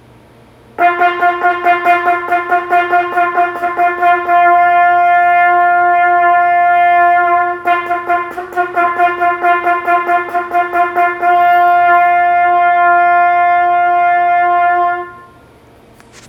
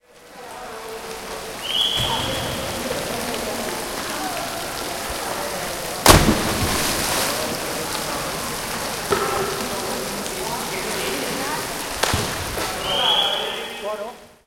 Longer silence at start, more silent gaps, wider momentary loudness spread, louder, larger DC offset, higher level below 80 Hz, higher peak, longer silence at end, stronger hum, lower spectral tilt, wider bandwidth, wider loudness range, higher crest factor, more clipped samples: first, 0.8 s vs 0.15 s; neither; second, 6 LU vs 12 LU; first, -11 LUFS vs -22 LUFS; neither; second, -54 dBFS vs -38 dBFS; about the same, 0 dBFS vs 0 dBFS; first, 1.05 s vs 0.15 s; neither; first, -5 dB/octave vs -2.5 dB/octave; second, 5.6 kHz vs 17 kHz; about the same, 4 LU vs 5 LU; second, 10 dB vs 24 dB; neither